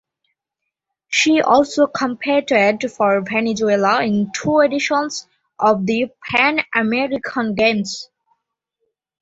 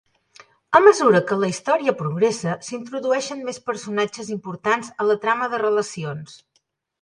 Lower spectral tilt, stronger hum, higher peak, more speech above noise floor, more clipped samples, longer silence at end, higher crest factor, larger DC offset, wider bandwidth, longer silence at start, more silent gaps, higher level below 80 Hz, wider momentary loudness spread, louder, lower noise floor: about the same, -4 dB/octave vs -5 dB/octave; neither; about the same, 0 dBFS vs 0 dBFS; first, 63 dB vs 48 dB; neither; first, 1.15 s vs 0.65 s; about the same, 18 dB vs 22 dB; neither; second, 8 kHz vs 11 kHz; first, 1.1 s vs 0.7 s; neither; first, -58 dBFS vs -68 dBFS; second, 7 LU vs 15 LU; first, -17 LUFS vs -21 LUFS; first, -80 dBFS vs -69 dBFS